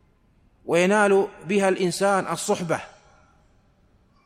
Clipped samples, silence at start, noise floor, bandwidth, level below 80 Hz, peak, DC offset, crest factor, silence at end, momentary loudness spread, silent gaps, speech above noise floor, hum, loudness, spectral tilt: under 0.1%; 0.65 s; -60 dBFS; 15 kHz; -62 dBFS; -8 dBFS; under 0.1%; 18 dB; 1.4 s; 9 LU; none; 38 dB; none; -22 LUFS; -4.5 dB/octave